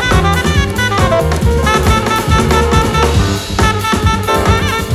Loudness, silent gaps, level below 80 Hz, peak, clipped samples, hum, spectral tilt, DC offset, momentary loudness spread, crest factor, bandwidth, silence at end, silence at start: -12 LUFS; none; -18 dBFS; 0 dBFS; under 0.1%; none; -5 dB/octave; under 0.1%; 3 LU; 12 dB; 15.5 kHz; 0 s; 0 s